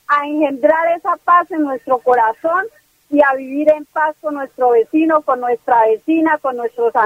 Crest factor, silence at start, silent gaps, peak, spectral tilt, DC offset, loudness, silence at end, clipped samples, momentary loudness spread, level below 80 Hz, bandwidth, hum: 16 dB; 0.1 s; none; 0 dBFS; -6 dB/octave; under 0.1%; -15 LUFS; 0 s; under 0.1%; 6 LU; -62 dBFS; 15.5 kHz; none